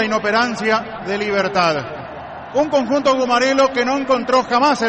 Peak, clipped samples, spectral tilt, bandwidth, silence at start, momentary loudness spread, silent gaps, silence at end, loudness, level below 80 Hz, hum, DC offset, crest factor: -4 dBFS; under 0.1%; -4 dB/octave; 8.6 kHz; 0 s; 9 LU; none; 0 s; -17 LUFS; -52 dBFS; none; under 0.1%; 12 dB